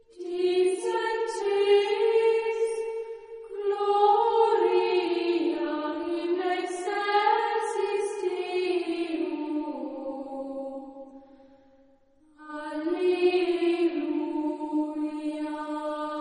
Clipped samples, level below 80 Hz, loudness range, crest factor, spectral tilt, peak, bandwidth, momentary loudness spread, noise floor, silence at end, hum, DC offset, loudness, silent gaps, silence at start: under 0.1%; -70 dBFS; 9 LU; 16 dB; -3 dB/octave; -10 dBFS; 10.5 kHz; 13 LU; -60 dBFS; 0 s; none; under 0.1%; -27 LUFS; none; 0.15 s